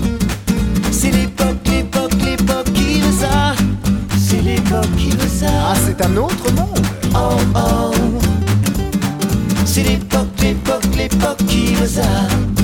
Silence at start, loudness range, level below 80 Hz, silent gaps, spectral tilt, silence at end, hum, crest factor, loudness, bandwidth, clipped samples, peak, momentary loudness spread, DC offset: 0 s; 1 LU; -24 dBFS; none; -5.5 dB/octave; 0 s; none; 12 dB; -16 LUFS; 17.5 kHz; under 0.1%; -2 dBFS; 3 LU; under 0.1%